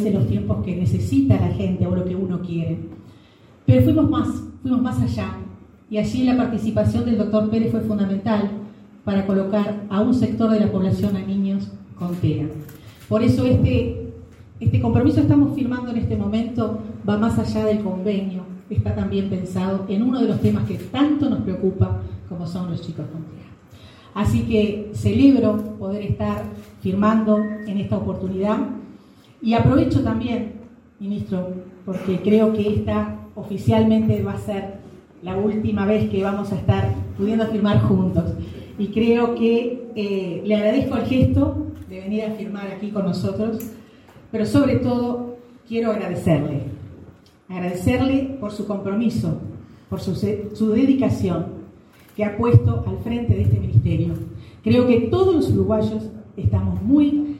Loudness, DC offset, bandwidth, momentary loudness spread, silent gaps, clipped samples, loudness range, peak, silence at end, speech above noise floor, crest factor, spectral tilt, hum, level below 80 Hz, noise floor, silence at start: -21 LUFS; under 0.1%; 14 kHz; 14 LU; none; under 0.1%; 4 LU; -2 dBFS; 0 s; 30 dB; 20 dB; -8.5 dB/octave; none; -42 dBFS; -49 dBFS; 0 s